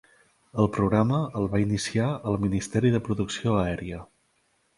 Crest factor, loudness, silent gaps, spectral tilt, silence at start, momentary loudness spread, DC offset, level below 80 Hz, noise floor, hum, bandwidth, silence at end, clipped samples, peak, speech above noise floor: 20 dB; -26 LUFS; none; -6.5 dB/octave; 0.55 s; 8 LU; under 0.1%; -48 dBFS; -69 dBFS; none; 11.5 kHz; 0.7 s; under 0.1%; -6 dBFS; 44 dB